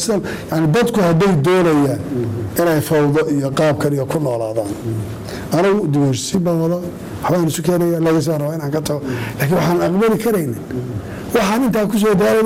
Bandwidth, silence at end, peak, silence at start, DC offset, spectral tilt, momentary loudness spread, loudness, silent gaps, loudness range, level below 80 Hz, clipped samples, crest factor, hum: 16.5 kHz; 0 s; -6 dBFS; 0 s; under 0.1%; -6 dB/octave; 10 LU; -17 LUFS; none; 3 LU; -44 dBFS; under 0.1%; 10 dB; none